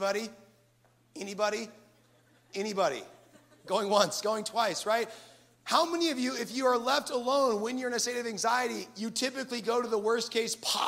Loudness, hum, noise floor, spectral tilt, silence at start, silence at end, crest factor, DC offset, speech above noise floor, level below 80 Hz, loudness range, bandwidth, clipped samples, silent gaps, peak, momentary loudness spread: -30 LUFS; none; -66 dBFS; -2.5 dB/octave; 0 s; 0 s; 22 dB; under 0.1%; 36 dB; -80 dBFS; 6 LU; 16 kHz; under 0.1%; none; -8 dBFS; 12 LU